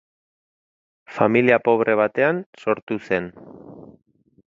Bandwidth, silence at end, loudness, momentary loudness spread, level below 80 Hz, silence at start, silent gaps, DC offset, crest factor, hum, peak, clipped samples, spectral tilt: 7.4 kHz; 0.7 s; -20 LUFS; 9 LU; -62 dBFS; 1.1 s; 2.46-2.53 s, 2.82-2.87 s; under 0.1%; 22 dB; none; 0 dBFS; under 0.1%; -8 dB/octave